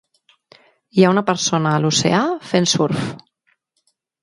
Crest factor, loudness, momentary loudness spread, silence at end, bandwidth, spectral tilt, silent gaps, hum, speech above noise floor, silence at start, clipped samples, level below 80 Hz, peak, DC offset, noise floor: 18 dB; -17 LUFS; 7 LU; 1.05 s; 11.5 kHz; -4.5 dB/octave; none; none; 51 dB; 0.95 s; under 0.1%; -60 dBFS; 0 dBFS; under 0.1%; -68 dBFS